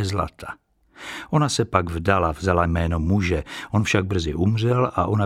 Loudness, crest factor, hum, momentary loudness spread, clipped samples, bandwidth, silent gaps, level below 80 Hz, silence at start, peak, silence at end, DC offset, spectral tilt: -22 LUFS; 20 dB; none; 14 LU; under 0.1%; 13 kHz; none; -36 dBFS; 0 s; -2 dBFS; 0 s; under 0.1%; -6 dB/octave